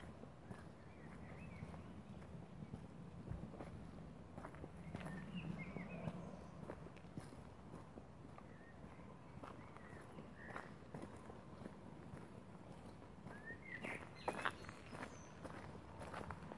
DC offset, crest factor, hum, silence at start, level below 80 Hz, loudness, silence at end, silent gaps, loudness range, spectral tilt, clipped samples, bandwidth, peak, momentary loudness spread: under 0.1%; 30 dB; none; 0 s; -68 dBFS; -54 LUFS; 0 s; none; 6 LU; -6 dB/octave; under 0.1%; 11.5 kHz; -22 dBFS; 9 LU